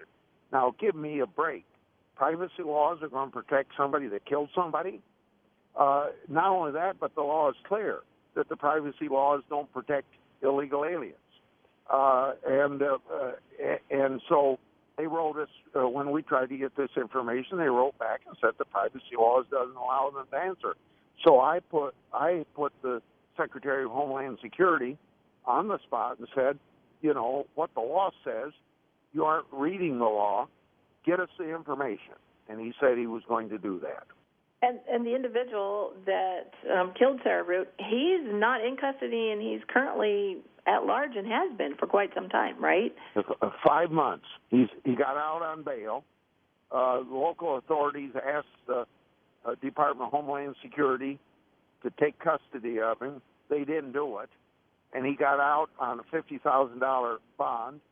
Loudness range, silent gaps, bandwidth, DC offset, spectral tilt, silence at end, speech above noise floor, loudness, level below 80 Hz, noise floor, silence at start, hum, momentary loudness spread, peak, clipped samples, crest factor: 4 LU; none; 4 kHz; under 0.1%; -8.5 dB/octave; 0.15 s; 42 dB; -29 LUFS; -76 dBFS; -71 dBFS; 0 s; none; 11 LU; -8 dBFS; under 0.1%; 22 dB